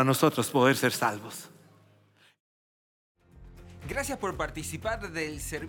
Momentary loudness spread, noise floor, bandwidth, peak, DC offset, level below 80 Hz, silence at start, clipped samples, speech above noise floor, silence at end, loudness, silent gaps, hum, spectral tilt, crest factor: 18 LU; -62 dBFS; 17.5 kHz; -10 dBFS; under 0.1%; -52 dBFS; 0 s; under 0.1%; 34 dB; 0 s; -28 LUFS; 2.40-3.15 s; none; -4.5 dB/octave; 22 dB